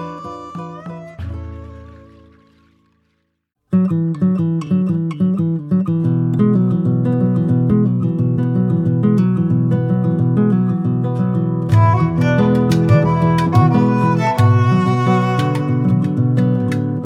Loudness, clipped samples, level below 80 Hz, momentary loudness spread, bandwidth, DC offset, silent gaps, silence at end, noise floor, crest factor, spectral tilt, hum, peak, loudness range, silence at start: -16 LUFS; under 0.1%; -44 dBFS; 15 LU; 10 kHz; under 0.1%; none; 0 s; -70 dBFS; 14 dB; -9 dB/octave; none; -2 dBFS; 9 LU; 0 s